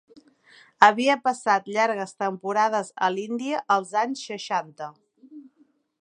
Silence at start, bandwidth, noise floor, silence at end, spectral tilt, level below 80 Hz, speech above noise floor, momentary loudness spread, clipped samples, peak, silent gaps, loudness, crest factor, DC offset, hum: 0.8 s; 10.5 kHz; -63 dBFS; 0.6 s; -3.5 dB/octave; -80 dBFS; 40 dB; 11 LU; under 0.1%; 0 dBFS; none; -24 LUFS; 24 dB; under 0.1%; none